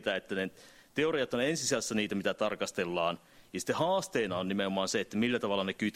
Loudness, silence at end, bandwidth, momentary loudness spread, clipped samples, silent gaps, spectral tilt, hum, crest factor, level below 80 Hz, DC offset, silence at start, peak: -32 LUFS; 0.05 s; 16 kHz; 6 LU; under 0.1%; none; -4 dB/octave; none; 18 dB; -68 dBFS; under 0.1%; 0 s; -14 dBFS